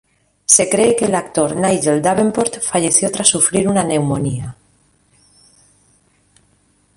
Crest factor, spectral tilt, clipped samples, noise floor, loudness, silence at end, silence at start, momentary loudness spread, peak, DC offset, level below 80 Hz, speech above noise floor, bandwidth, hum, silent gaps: 18 dB; -3.5 dB/octave; under 0.1%; -58 dBFS; -15 LUFS; 2.45 s; 0.5 s; 9 LU; 0 dBFS; under 0.1%; -50 dBFS; 42 dB; 16 kHz; none; none